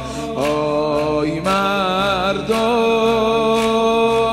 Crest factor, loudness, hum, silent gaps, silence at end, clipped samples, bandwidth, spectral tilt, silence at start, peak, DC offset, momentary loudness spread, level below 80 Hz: 12 dB; -17 LUFS; none; none; 0 s; under 0.1%; 15 kHz; -5 dB/octave; 0 s; -4 dBFS; under 0.1%; 4 LU; -42 dBFS